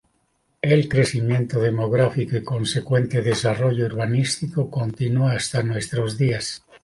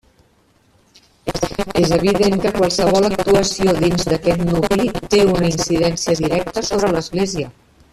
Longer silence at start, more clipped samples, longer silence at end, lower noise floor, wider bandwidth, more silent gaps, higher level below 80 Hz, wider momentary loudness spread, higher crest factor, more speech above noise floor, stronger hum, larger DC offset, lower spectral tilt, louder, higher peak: second, 0.65 s vs 1.25 s; neither; second, 0.25 s vs 0.4 s; first, -68 dBFS vs -56 dBFS; second, 11.5 kHz vs 14.5 kHz; neither; second, -52 dBFS vs -36 dBFS; about the same, 5 LU vs 7 LU; about the same, 16 dB vs 14 dB; first, 47 dB vs 40 dB; neither; neither; about the same, -6 dB/octave vs -5 dB/octave; second, -22 LUFS vs -17 LUFS; about the same, -4 dBFS vs -2 dBFS